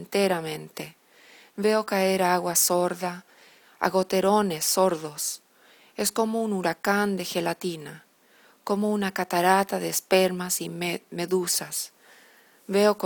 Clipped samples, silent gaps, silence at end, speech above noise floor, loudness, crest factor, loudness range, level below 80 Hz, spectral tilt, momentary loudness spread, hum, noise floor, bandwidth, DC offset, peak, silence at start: under 0.1%; none; 0 s; 33 dB; -25 LUFS; 20 dB; 4 LU; -70 dBFS; -3.5 dB/octave; 14 LU; none; -58 dBFS; 19.5 kHz; under 0.1%; -6 dBFS; 0 s